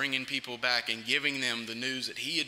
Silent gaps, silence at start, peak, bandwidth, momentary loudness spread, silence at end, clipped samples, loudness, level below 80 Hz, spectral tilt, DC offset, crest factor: none; 0 s; -12 dBFS; 16 kHz; 5 LU; 0 s; under 0.1%; -30 LUFS; -74 dBFS; -1.5 dB/octave; under 0.1%; 20 dB